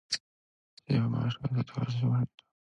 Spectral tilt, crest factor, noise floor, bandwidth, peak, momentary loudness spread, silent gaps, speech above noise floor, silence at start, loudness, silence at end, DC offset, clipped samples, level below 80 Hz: -6 dB/octave; 16 dB; under -90 dBFS; 11 kHz; -16 dBFS; 6 LU; 0.20-0.77 s; over 60 dB; 0.1 s; -32 LUFS; 0.4 s; under 0.1%; under 0.1%; -62 dBFS